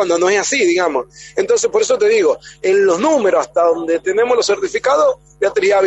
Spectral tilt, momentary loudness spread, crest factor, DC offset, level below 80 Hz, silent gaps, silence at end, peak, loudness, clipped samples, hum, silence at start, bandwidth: -2.5 dB/octave; 6 LU; 12 dB; under 0.1%; -54 dBFS; none; 0 s; -2 dBFS; -15 LUFS; under 0.1%; none; 0 s; 8.4 kHz